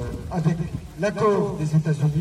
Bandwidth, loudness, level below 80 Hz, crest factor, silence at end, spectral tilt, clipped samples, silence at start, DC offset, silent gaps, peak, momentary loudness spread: 11.5 kHz; -23 LUFS; -42 dBFS; 14 dB; 0 s; -8 dB/octave; under 0.1%; 0 s; under 0.1%; none; -8 dBFS; 7 LU